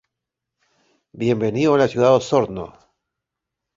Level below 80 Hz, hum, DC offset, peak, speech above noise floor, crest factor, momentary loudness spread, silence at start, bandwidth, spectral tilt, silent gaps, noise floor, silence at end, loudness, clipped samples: -56 dBFS; none; under 0.1%; -2 dBFS; 65 dB; 20 dB; 13 LU; 1.15 s; 7.8 kHz; -6.5 dB/octave; none; -83 dBFS; 1.05 s; -18 LUFS; under 0.1%